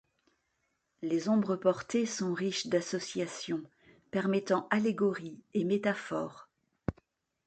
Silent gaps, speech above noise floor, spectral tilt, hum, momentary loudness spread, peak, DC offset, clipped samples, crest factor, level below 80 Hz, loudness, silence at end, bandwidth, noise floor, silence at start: none; 48 dB; -5 dB/octave; none; 12 LU; -12 dBFS; under 0.1%; under 0.1%; 20 dB; -64 dBFS; -33 LUFS; 0.55 s; 9 kHz; -79 dBFS; 1 s